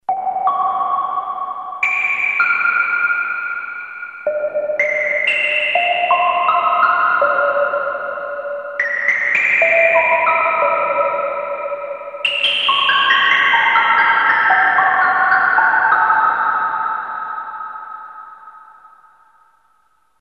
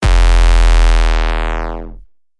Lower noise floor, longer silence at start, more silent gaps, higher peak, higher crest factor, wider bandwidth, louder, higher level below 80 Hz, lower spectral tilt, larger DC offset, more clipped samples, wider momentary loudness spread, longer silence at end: first, -60 dBFS vs -37 dBFS; about the same, 0.1 s vs 0 s; neither; about the same, 0 dBFS vs 0 dBFS; first, 16 dB vs 10 dB; about the same, 10 kHz vs 11 kHz; about the same, -15 LUFS vs -14 LUFS; second, -64 dBFS vs -10 dBFS; second, -2 dB/octave vs -5 dB/octave; neither; neither; about the same, 13 LU vs 14 LU; first, 1.35 s vs 0.4 s